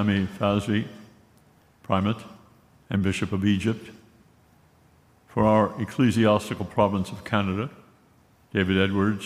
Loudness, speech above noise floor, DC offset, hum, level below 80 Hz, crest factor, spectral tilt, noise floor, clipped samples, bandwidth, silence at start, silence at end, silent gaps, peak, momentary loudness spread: -25 LUFS; 35 dB; under 0.1%; none; -56 dBFS; 20 dB; -6.5 dB/octave; -59 dBFS; under 0.1%; 14 kHz; 0 s; 0 s; none; -6 dBFS; 9 LU